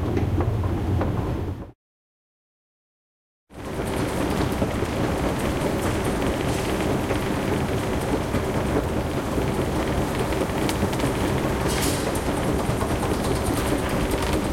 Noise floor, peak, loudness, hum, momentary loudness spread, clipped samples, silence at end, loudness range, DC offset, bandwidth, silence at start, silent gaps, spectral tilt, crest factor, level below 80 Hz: under -90 dBFS; -8 dBFS; -25 LUFS; none; 2 LU; under 0.1%; 0 s; 6 LU; under 0.1%; 16.5 kHz; 0 s; 1.75-3.47 s; -5.5 dB/octave; 18 dB; -34 dBFS